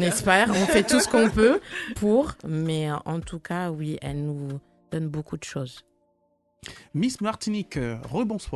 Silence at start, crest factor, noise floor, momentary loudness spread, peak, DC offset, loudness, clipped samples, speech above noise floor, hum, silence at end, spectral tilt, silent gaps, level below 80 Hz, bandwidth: 0 s; 20 dB; -69 dBFS; 15 LU; -4 dBFS; under 0.1%; -25 LUFS; under 0.1%; 44 dB; none; 0 s; -5 dB/octave; none; -46 dBFS; 12.5 kHz